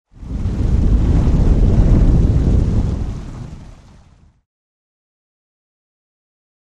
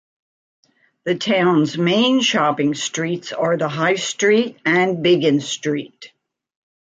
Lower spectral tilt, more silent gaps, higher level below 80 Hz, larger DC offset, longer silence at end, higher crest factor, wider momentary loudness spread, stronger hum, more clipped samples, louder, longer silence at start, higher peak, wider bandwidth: first, -9 dB/octave vs -4.5 dB/octave; neither; first, -18 dBFS vs -68 dBFS; neither; first, 3 s vs 0.85 s; about the same, 16 dB vs 16 dB; first, 16 LU vs 8 LU; neither; neither; about the same, -16 LUFS vs -18 LUFS; second, 0.2 s vs 1.05 s; about the same, -2 dBFS vs -4 dBFS; second, 7.8 kHz vs 9.4 kHz